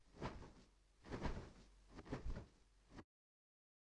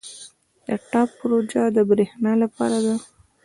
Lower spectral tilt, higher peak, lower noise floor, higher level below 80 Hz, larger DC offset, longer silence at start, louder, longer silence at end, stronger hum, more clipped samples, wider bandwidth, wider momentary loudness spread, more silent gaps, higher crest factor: about the same, -6.5 dB/octave vs -6 dB/octave; second, -32 dBFS vs -6 dBFS; first, -70 dBFS vs -47 dBFS; first, -58 dBFS vs -64 dBFS; neither; about the same, 0 s vs 0.05 s; second, -54 LUFS vs -21 LUFS; first, 0.95 s vs 0.4 s; neither; neither; about the same, 10.5 kHz vs 11.5 kHz; first, 16 LU vs 12 LU; neither; first, 22 dB vs 16 dB